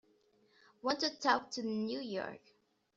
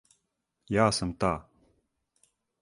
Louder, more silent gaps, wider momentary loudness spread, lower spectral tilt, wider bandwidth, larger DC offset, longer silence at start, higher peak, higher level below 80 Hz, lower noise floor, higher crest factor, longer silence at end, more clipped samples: second, -36 LUFS vs -28 LUFS; neither; first, 10 LU vs 7 LU; second, -1.5 dB/octave vs -5 dB/octave; second, 7.6 kHz vs 11.5 kHz; neither; first, 0.85 s vs 0.7 s; second, -14 dBFS vs -8 dBFS; second, -80 dBFS vs -52 dBFS; second, -71 dBFS vs -81 dBFS; about the same, 24 dB vs 24 dB; second, 0.6 s vs 1.2 s; neither